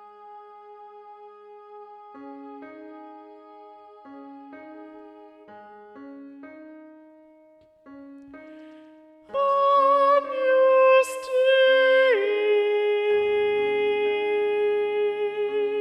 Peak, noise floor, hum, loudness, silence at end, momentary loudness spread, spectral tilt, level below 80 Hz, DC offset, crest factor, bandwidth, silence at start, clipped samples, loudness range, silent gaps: -10 dBFS; -56 dBFS; none; -21 LUFS; 0 s; 27 LU; -2.5 dB/octave; -72 dBFS; under 0.1%; 16 dB; 12.5 kHz; 0.25 s; under 0.1%; 25 LU; none